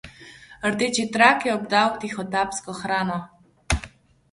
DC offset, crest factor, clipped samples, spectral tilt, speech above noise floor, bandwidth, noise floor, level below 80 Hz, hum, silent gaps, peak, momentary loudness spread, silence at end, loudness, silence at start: under 0.1%; 22 dB; under 0.1%; -3.5 dB/octave; 24 dB; 11.5 kHz; -46 dBFS; -42 dBFS; none; none; -2 dBFS; 13 LU; 0.45 s; -23 LUFS; 0.05 s